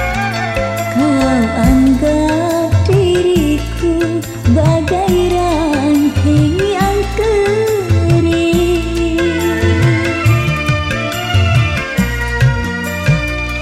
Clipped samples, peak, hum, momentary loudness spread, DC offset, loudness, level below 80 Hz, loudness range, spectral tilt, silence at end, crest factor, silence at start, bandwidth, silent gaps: under 0.1%; -2 dBFS; none; 5 LU; under 0.1%; -13 LUFS; -24 dBFS; 1 LU; -6.5 dB/octave; 0 s; 12 dB; 0 s; 16 kHz; none